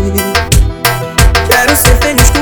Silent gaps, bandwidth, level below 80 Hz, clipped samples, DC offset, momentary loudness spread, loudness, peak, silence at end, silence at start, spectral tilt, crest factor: none; over 20 kHz; -12 dBFS; 2%; under 0.1%; 5 LU; -9 LUFS; 0 dBFS; 0 s; 0 s; -3.5 dB/octave; 8 dB